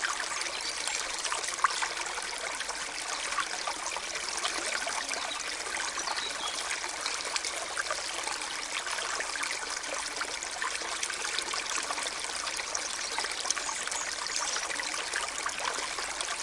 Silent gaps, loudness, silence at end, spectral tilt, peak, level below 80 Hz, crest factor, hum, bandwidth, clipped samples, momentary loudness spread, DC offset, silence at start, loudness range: none; -32 LUFS; 0 s; 1.5 dB/octave; -10 dBFS; -62 dBFS; 24 dB; none; 12 kHz; under 0.1%; 3 LU; under 0.1%; 0 s; 1 LU